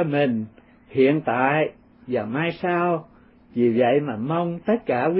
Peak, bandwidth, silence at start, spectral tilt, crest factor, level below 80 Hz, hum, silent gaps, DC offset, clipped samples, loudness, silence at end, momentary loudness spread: -4 dBFS; 5.6 kHz; 0 s; -11.5 dB/octave; 18 dB; -62 dBFS; none; none; under 0.1%; under 0.1%; -23 LUFS; 0 s; 9 LU